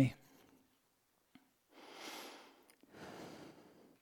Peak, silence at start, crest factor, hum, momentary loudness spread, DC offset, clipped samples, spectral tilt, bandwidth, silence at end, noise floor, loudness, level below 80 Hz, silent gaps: -20 dBFS; 0 s; 26 dB; none; 19 LU; under 0.1%; under 0.1%; -6 dB/octave; 19 kHz; 0.1 s; -78 dBFS; -48 LUFS; -76 dBFS; none